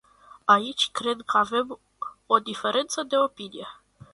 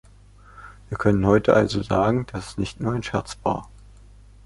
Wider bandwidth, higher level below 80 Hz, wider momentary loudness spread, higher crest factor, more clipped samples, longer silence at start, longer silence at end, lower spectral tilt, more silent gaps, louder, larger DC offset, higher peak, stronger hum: about the same, 11.5 kHz vs 11.5 kHz; second, -68 dBFS vs -42 dBFS; first, 17 LU vs 12 LU; about the same, 22 dB vs 22 dB; neither; about the same, 0.45 s vs 0.55 s; second, 0.4 s vs 0.8 s; second, -2.5 dB/octave vs -7 dB/octave; neither; about the same, -24 LUFS vs -22 LUFS; neither; about the same, -4 dBFS vs -2 dBFS; second, none vs 50 Hz at -40 dBFS